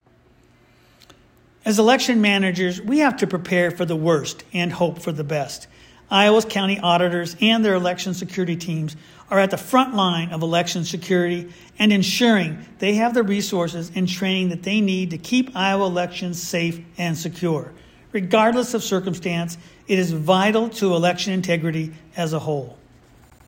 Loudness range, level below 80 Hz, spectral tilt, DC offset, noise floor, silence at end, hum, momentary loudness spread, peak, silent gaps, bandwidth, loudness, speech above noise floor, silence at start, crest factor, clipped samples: 3 LU; -58 dBFS; -5 dB/octave; under 0.1%; -55 dBFS; 0.75 s; none; 10 LU; -2 dBFS; none; 16.5 kHz; -20 LUFS; 35 dB; 1.65 s; 18 dB; under 0.1%